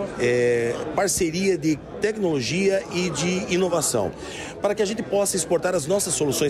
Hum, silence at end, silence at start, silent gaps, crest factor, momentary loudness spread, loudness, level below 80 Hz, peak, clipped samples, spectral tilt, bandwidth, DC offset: none; 0 s; 0 s; none; 14 dB; 5 LU; -23 LUFS; -50 dBFS; -10 dBFS; under 0.1%; -4 dB/octave; 15.5 kHz; under 0.1%